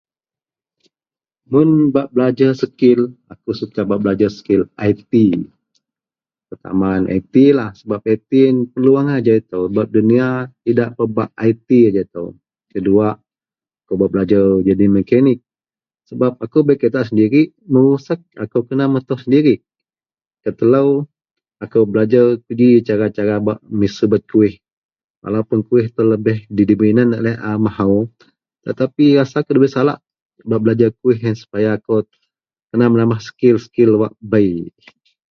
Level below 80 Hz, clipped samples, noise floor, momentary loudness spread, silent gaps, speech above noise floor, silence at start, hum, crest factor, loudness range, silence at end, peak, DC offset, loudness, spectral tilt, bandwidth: -50 dBFS; under 0.1%; under -90 dBFS; 11 LU; 20.27-20.31 s, 24.73-24.89 s, 25.04-25.22 s, 30.22-30.29 s, 32.64-32.68 s; over 76 dB; 1.5 s; none; 16 dB; 2 LU; 0.6 s; 0 dBFS; under 0.1%; -15 LUFS; -9 dB/octave; 6.6 kHz